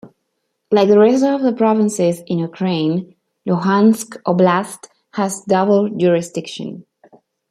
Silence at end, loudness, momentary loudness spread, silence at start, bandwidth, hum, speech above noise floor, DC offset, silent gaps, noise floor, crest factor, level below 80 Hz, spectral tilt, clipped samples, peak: 0.7 s; -16 LUFS; 15 LU; 0.05 s; 14.5 kHz; none; 56 dB; under 0.1%; none; -72 dBFS; 14 dB; -64 dBFS; -6 dB/octave; under 0.1%; -2 dBFS